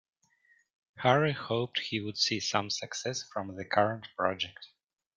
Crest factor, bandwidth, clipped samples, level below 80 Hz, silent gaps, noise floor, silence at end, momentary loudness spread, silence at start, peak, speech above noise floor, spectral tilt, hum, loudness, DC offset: 24 dB; 11 kHz; under 0.1%; -72 dBFS; none; -68 dBFS; 0.5 s; 10 LU; 0.95 s; -8 dBFS; 37 dB; -4 dB/octave; none; -31 LUFS; under 0.1%